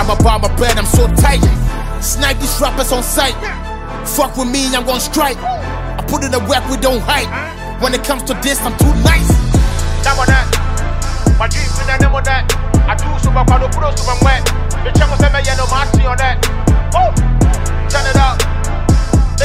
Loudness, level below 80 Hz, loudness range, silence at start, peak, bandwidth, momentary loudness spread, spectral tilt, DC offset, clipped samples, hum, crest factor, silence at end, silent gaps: -14 LUFS; -16 dBFS; 3 LU; 0 s; 0 dBFS; 16.5 kHz; 7 LU; -4.5 dB/octave; under 0.1%; under 0.1%; none; 12 dB; 0 s; none